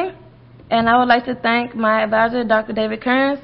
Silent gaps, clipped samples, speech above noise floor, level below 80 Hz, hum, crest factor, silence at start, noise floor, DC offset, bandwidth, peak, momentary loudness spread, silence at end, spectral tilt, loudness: none; under 0.1%; 27 dB; -50 dBFS; none; 16 dB; 0 s; -43 dBFS; under 0.1%; 5.8 kHz; -2 dBFS; 7 LU; 0.05 s; -10 dB/octave; -17 LUFS